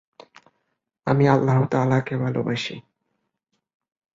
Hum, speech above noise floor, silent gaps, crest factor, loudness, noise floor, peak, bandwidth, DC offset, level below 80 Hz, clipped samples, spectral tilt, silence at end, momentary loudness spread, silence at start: none; 56 dB; none; 20 dB; -22 LUFS; -77 dBFS; -4 dBFS; 7.6 kHz; under 0.1%; -58 dBFS; under 0.1%; -7.5 dB/octave; 1.35 s; 14 LU; 1.05 s